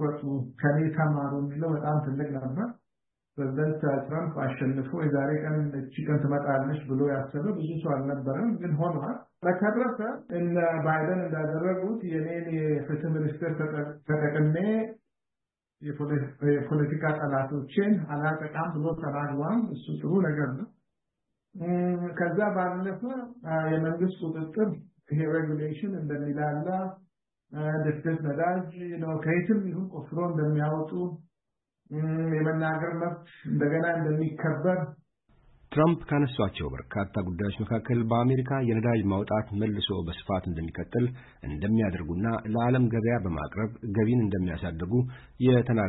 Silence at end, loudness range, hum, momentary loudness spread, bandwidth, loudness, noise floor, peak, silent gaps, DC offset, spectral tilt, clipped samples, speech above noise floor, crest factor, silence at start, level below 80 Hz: 0 s; 3 LU; none; 8 LU; 4.1 kHz; -29 LUFS; -89 dBFS; -12 dBFS; none; under 0.1%; -12 dB/octave; under 0.1%; 61 dB; 16 dB; 0 s; -54 dBFS